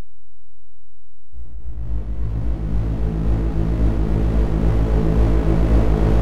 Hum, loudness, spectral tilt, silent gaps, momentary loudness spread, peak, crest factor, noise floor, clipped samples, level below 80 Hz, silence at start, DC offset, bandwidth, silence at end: none; -21 LUFS; -9 dB/octave; none; 11 LU; -6 dBFS; 12 dB; -59 dBFS; under 0.1%; -20 dBFS; 0 s; under 0.1%; 4.9 kHz; 0 s